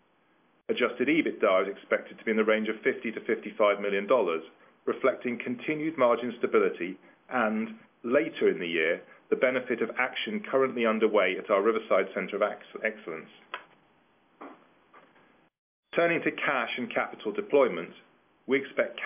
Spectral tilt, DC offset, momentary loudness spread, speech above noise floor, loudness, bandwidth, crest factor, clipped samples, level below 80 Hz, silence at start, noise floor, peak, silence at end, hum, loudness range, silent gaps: -8.5 dB/octave; under 0.1%; 12 LU; 39 dB; -28 LUFS; 3.7 kHz; 18 dB; under 0.1%; -80 dBFS; 0.7 s; -67 dBFS; -10 dBFS; 0 s; none; 6 LU; 15.58-15.83 s